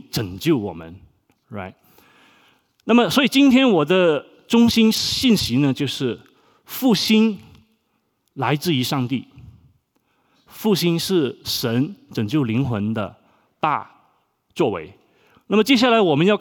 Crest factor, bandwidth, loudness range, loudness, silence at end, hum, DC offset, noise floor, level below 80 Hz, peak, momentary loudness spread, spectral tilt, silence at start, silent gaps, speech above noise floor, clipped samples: 16 dB; over 20 kHz; 8 LU; -19 LUFS; 0 s; none; under 0.1%; -69 dBFS; -54 dBFS; -4 dBFS; 17 LU; -5 dB/octave; 0.15 s; none; 51 dB; under 0.1%